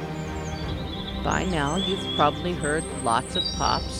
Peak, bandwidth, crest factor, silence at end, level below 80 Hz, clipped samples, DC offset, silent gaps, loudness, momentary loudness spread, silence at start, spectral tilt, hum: -6 dBFS; 16 kHz; 20 dB; 0 s; -38 dBFS; under 0.1%; under 0.1%; none; -26 LUFS; 9 LU; 0 s; -4.5 dB/octave; none